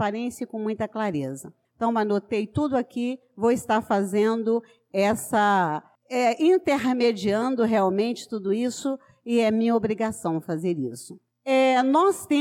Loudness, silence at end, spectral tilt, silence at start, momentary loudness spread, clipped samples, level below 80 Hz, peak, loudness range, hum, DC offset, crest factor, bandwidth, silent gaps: -24 LUFS; 0 s; -5.5 dB/octave; 0 s; 11 LU; under 0.1%; -62 dBFS; -12 dBFS; 3 LU; none; under 0.1%; 12 dB; 16 kHz; none